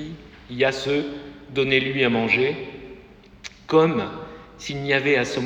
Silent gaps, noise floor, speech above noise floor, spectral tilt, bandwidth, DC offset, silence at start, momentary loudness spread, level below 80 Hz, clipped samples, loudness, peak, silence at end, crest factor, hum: none; -47 dBFS; 25 dB; -5 dB/octave; 8.8 kHz; under 0.1%; 0 s; 21 LU; -52 dBFS; under 0.1%; -22 LUFS; -2 dBFS; 0 s; 22 dB; none